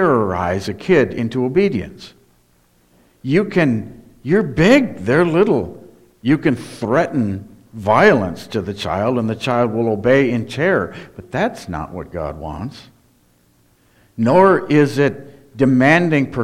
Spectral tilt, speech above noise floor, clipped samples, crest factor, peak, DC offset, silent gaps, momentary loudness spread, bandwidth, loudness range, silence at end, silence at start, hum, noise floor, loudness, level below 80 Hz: -7 dB/octave; 40 dB; under 0.1%; 18 dB; 0 dBFS; under 0.1%; none; 16 LU; 14 kHz; 4 LU; 0 s; 0 s; none; -56 dBFS; -17 LUFS; -46 dBFS